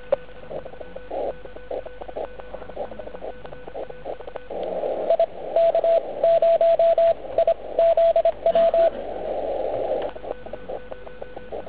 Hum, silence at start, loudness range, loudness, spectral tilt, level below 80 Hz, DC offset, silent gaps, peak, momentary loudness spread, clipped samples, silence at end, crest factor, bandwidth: none; 0 s; 15 LU; -21 LUFS; -8.5 dB/octave; -50 dBFS; 1%; none; -8 dBFS; 19 LU; under 0.1%; 0 s; 14 dB; 4 kHz